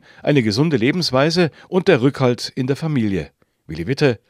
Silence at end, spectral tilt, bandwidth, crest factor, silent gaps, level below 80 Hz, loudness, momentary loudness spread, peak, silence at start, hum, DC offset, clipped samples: 0.15 s; -6 dB/octave; 14.5 kHz; 18 dB; none; -52 dBFS; -18 LUFS; 9 LU; 0 dBFS; 0.25 s; none; under 0.1%; under 0.1%